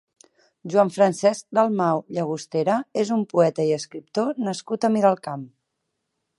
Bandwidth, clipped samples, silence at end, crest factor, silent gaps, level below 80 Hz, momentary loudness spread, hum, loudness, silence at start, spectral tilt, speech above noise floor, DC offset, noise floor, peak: 11.5 kHz; under 0.1%; 0.9 s; 18 dB; none; -74 dBFS; 9 LU; none; -22 LUFS; 0.65 s; -6 dB/octave; 56 dB; under 0.1%; -78 dBFS; -4 dBFS